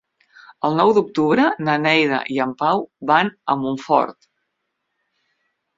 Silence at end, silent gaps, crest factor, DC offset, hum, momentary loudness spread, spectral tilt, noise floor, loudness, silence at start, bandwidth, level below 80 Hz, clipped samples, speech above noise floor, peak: 1.65 s; none; 18 dB; under 0.1%; none; 7 LU; -6 dB/octave; -76 dBFS; -19 LUFS; 0.65 s; 7.8 kHz; -64 dBFS; under 0.1%; 57 dB; -2 dBFS